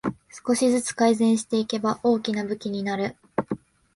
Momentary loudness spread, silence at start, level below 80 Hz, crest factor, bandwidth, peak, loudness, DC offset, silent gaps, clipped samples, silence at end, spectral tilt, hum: 11 LU; 0.05 s; -62 dBFS; 16 dB; 11.5 kHz; -8 dBFS; -24 LUFS; under 0.1%; none; under 0.1%; 0.4 s; -4.5 dB/octave; none